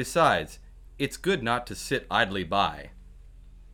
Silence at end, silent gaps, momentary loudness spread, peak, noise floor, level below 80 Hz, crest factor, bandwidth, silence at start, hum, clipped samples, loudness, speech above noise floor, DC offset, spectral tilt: 0 s; none; 13 LU; -8 dBFS; -48 dBFS; -48 dBFS; 20 dB; 19.5 kHz; 0 s; none; under 0.1%; -27 LUFS; 21 dB; under 0.1%; -4 dB/octave